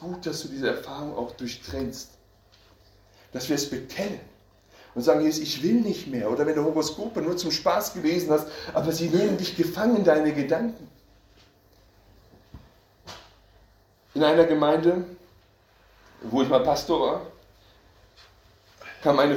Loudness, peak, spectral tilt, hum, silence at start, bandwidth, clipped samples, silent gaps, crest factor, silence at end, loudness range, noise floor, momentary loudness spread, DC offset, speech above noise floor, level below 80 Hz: -25 LUFS; -6 dBFS; -5 dB/octave; none; 0 s; 17 kHz; under 0.1%; none; 20 dB; 0 s; 10 LU; -59 dBFS; 19 LU; under 0.1%; 35 dB; -56 dBFS